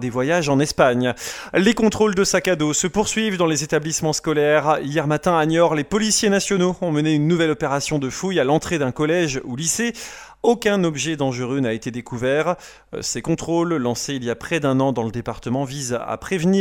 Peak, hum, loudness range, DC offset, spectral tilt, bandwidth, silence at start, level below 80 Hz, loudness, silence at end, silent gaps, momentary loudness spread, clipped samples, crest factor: -2 dBFS; none; 4 LU; under 0.1%; -4.5 dB/octave; 17.5 kHz; 0 s; -48 dBFS; -20 LUFS; 0 s; none; 8 LU; under 0.1%; 18 dB